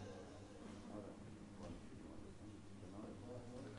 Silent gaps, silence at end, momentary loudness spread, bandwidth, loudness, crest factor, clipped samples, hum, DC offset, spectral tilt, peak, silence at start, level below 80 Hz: none; 0 s; 4 LU; 10.5 kHz; -56 LUFS; 14 dB; under 0.1%; none; under 0.1%; -6.5 dB/octave; -40 dBFS; 0 s; -68 dBFS